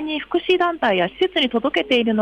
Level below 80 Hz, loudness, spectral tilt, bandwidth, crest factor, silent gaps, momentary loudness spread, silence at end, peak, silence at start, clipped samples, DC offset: -54 dBFS; -19 LUFS; -5.5 dB/octave; 8.8 kHz; 12 dB; none; 3 LU; 0 s; -8 dBFS; 0 s; under 0.1%; under 0.1%